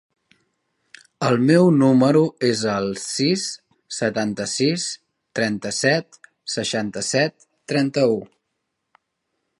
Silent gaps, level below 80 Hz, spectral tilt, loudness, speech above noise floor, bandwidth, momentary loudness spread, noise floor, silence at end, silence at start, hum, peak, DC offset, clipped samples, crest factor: none; -64 dBFS; -5 dB/octave; -20 LUFS; 57 dB; 11.5 kHz; 13 LU; -77 dBFS; 1.35 s; 1.2 s; none; -2 dBFS; under 0.1%; under 0.1%; 18 dB